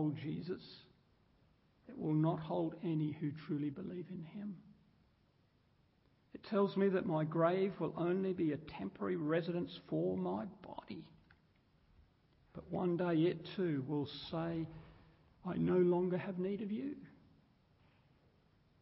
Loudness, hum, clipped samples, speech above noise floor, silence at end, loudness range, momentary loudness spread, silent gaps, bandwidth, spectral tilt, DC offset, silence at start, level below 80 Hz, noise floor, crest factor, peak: -38 LUFS; none; under 0.1%; 36 dB; 1.7 s; 7 LU; 16 LU; none; 5.6 kHz; -7 dB/octave; under 0.1%; 0 s; -72 dBFS; -73 dBFS; 18 dB; -20 dBFS